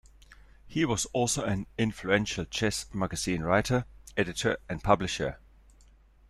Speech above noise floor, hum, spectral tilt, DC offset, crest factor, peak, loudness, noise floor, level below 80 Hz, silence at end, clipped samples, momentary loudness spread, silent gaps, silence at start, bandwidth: 29 dB; none; -4.5 dB/octave; under 0.1%; 22 dB; -8 dBFS; -29 LUFS; -58 dBFS; -50 dBFS; 0.95 s; under 0.1%; 7 LU; none; 0.3 s; 14 kHz